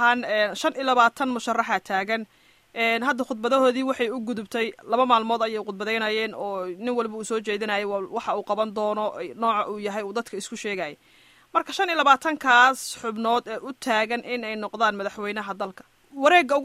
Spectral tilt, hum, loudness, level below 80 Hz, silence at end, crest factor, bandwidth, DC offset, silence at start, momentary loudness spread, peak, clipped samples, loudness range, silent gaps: -3 dB/octave; none; -24 LUFS; -70 dBFS; 0 s; 20 dB; 16 kHz; under 0.1%; 0 s; 12 LU; -4 dBFS; under 0.1%; 5 LU; none